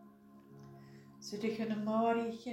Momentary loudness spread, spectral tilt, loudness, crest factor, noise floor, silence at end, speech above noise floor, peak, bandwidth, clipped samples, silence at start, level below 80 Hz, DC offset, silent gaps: 24 LU; -6 dB/octave; -36 LUFS; 18 dB; -59 dBFS; 0 s; 24 dB; -20 dBFS; 13.5 kHz; under 0.1%; 0 s; -78 dBFS; under 0.1%; none